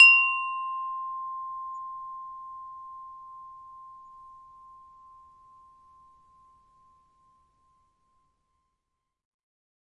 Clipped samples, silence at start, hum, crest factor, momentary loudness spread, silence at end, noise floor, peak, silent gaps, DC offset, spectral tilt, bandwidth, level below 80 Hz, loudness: under 0.1%; 0 s; none; 26 dB; 23 LU; 5.65 s; -83 dBFS; -6 dBFS; none; under 0.1%; 3.5 dB/octave; 9.6 kHz; -74 dBFS; -26 LUFS